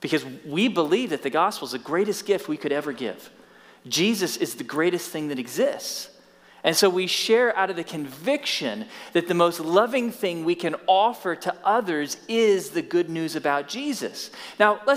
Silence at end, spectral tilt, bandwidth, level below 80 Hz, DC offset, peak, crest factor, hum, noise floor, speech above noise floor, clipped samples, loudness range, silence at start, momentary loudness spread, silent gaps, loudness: 0 s; -3.5 dB/octave; 16 kHz; -76 dBFS; under 0.1%; -4 dBFS; 20 dB; none; -45 dBFS; 21 dB; under 0.1%; 3 LU; 0 s; 11 LU; none; -24 LUFS